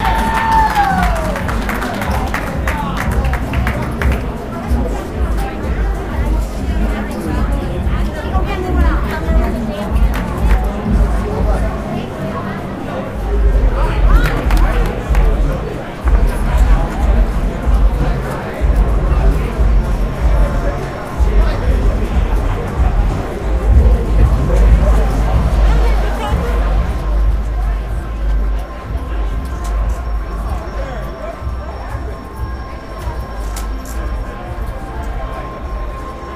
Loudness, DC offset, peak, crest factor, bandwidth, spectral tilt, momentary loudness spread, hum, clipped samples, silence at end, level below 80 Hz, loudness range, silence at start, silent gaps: -18 LUFS; under 0.1%; 0 dBFS; 14 dB; 14.5 kHz; -7 dB/octave; 11 LU; none; under 0.1%; 0 s; -16 dBFS; 10 LU; 0 s; none